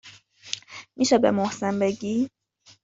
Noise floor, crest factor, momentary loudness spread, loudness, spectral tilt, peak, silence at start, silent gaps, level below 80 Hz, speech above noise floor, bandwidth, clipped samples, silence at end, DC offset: -48 dBFS; 20 dB; 14 LU; -25 LUFS; -4.5 dB/octave; -6 dBFS; 0.05 s; none; -64 dBFS; 25 dB; 7.8 kHz; under 0.1%; 0.55 s; under 0.1%